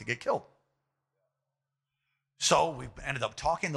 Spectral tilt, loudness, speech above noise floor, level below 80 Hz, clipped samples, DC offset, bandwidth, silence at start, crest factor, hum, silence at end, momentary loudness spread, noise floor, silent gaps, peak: -3 dB/octave; -30 LUFS; 56 dB; -56 dBFS; under 0.1%; under 0.1%; 13.5 kHz; 0 s; 24 dB; none; 0 s; 10 LU; -87 dBFS; none; -10 dBFS